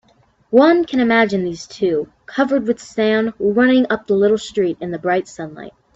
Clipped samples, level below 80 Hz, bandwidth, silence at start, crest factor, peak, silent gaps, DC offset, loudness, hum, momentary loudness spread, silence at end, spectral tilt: under 0.1%; -56 dBFS; 8 kHz; 0.5 s; 16 dB; 0 dBFS; none; under 0.1%; -17 LUFS; none; 11 LU; 0.25 s; -5.5 dB/octave